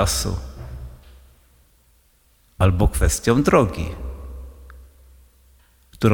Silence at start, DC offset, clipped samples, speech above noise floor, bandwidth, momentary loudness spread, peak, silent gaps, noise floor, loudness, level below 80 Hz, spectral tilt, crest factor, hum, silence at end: 0 s; under 0.1%; under 0.1%; 40 dB; 19.5 kHz; 22 LU; -2 dBFS; none; -58 dBFS; -20 LUFS; -30 dBFS; -5.5 dB/octave; 20 dB; none; 0 s